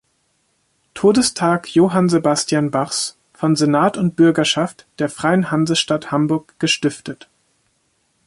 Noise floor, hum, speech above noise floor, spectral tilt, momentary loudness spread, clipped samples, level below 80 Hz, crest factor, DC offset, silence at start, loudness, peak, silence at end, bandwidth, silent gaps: -65 dBFS; none; 48 dB; -4.5 dB/octave; 10 LU; under 0.1%; -58 dBFS; 16 dB; under 0.1%; 0.95 s; -17 LUFS; -2 dBFS; 1.15 s; 11.5 kHz; none